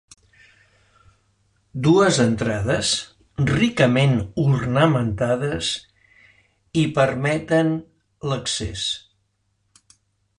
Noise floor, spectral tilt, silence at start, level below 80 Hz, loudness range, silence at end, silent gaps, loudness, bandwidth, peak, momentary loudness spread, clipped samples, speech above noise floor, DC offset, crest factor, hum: -69 dBFS; -5 dB/octave; 1.75 s; -46 dBFS; 4 LU; 1.4 s; none; -21 LUFS; 11 kHz; -4 dBFS; 10 LU; under 0.1%; 50 dB; under 0.1%; 18 dB; none